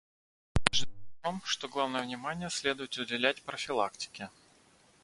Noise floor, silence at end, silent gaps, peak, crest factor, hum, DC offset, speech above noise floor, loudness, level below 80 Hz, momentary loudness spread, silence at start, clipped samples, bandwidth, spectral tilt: -64 dBFS; 0.75 s; none; 0 dBFS; 34 dB; none; under 0.1%; 29 dB; -33 LUFS; -50 dBFS; 11 LU; 0.55 s; under 0.1%; 11.5 kHz; -3 dB/octave